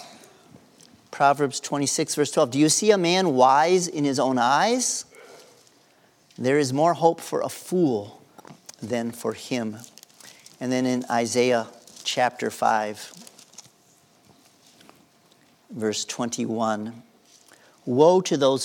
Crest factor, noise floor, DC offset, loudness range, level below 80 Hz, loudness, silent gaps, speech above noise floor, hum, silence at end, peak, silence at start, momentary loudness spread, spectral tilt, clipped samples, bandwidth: 20 dB; -59 dBFS; under 0.1%; 10 LU; -80 dBFS; -23 LUFS; none; 37 dB; none; 0 s; -4 dBFS; 0 s; 16 LU; -4 dB/octave; under 0.1%; 18.5 kHz